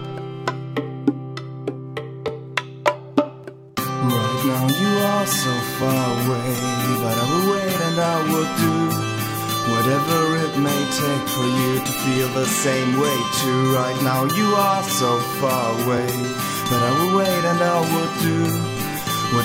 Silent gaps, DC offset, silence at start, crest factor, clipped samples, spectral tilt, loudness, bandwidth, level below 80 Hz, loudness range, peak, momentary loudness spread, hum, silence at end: none; under 0.1%; 0 s; 20 dB; under 0.1%; -4.5 dB/octave; -20 LUFS; 16.5 kHz; -54 dBFS; 5 LU; 0 dBFS; 9 LU; none; 0 s